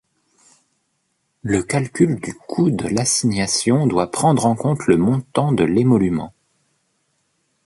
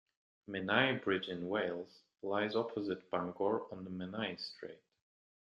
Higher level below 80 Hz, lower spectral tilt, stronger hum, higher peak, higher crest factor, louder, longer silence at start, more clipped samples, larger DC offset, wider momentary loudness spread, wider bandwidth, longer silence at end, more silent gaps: first, -48 dBFS vs -78 dBFS; about the same, -5.5 dB/octave vs -6.5 dB/octave; neither; first, -2 dBFS vs -14 dBFS; second, 18 dB vs 24 dB; first, -18 LUFS vs -37 LUFS; first, 1.45 s vs 0.5 s; neither; neither; second, 6 LU vs 14 LU; first, 11.5 kHz vs 7.6 kHz; first, 1.35 s vs 0.8 s; neither